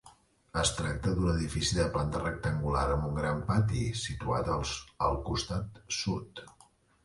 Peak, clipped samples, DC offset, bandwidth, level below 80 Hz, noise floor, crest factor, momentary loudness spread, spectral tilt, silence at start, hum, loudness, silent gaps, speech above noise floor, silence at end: -14 dBFS; under 0.1%; under 0.1%; 11.5 kHz; -42 dBFS; -63 dBFS; 18 dB; 7 LU; -5 dB/octave; 0.05 s; none; -32 LUFS; none; 32 dB; 0.55 s